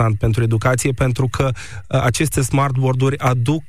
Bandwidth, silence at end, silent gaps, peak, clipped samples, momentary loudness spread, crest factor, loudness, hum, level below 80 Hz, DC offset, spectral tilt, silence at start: 15.5 kHz; 0.05 s; none; -6 dBFS; under 0.1%; 4 LU; 12 dB; -18 LUFS; none; -36 dBFS; 2%; -6 dB/octave; 0 s